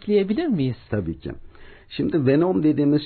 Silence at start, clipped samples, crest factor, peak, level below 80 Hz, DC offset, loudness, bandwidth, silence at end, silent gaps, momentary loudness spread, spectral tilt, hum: 0.05 s; under 0.1%; 14 dB; -8 dBFS; -46 dBFS; under 0.1%; -22 LUFS; 4.5 kHz; 0 s; none; 16 LU; -12.5 dB/octave; none